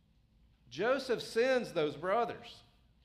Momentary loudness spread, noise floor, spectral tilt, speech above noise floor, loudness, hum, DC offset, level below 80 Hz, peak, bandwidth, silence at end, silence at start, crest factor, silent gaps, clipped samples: 17 LU; -67 dBFS; -4.5 dB/octave; 34 dB; -33 LUFS; none; under 0.1%; -68 dBFS; -20 dBFS; 14.5 kHz; 0.45 s; 0.7 s; 16 dB; none; under 0.1%